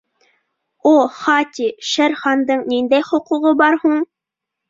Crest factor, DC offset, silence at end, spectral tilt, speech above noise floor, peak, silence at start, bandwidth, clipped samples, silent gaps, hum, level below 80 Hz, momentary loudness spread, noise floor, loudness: 16 dB; under 0.1%; 0.65 s; -3 dB/octave; 67 dB; -2 dBFS; 0.85 s; 7.8 kHz; under 0.1%; none; none; -66 dBFS; 7 LU; -82 dBFS; -16 LUFS